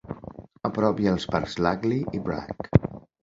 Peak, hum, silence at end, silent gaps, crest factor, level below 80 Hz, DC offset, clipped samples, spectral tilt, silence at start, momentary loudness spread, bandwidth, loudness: -2 dBFS; none; 0.25 s; none; 24 dB; -44 dBFS; under 0.1%; under 0.1%; -7.5 dB/octave; 0.05 s; 15 LU; 7.8 kHz; -26 LUFS